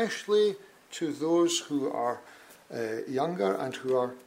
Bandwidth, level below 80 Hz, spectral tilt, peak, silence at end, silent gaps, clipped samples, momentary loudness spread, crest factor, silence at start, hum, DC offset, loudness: 16 kHz; -80 dBFS; -4 dB/octave; -14 dBFS; 0.05 s; none; under 0.1%; 12 LU; 14 dB; 0 s; none; under 0.1%; -29 LUFS